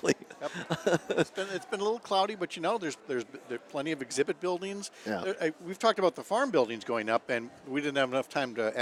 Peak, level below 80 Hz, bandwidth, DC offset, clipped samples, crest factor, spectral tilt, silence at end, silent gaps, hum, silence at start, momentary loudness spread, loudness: -10 dBFS; -76 dBFS; 14.5 kHz; under 0.1%; under 0.1%; 22 dB; -4 dB/octave; 0 s; none; none; 0.05 s; 8 LU; -32 LUFS